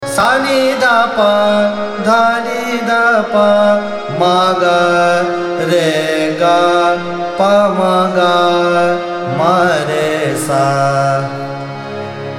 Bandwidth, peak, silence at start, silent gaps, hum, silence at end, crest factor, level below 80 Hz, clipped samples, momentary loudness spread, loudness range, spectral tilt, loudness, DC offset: 16 kHz; 0 dBFS; 0 s; none; none; 0 s; 12 dB; -54 dBFS; under 0.1%; 7 LU; 1 LU; -5 dB/octave; -12 LUFS; under 0.1%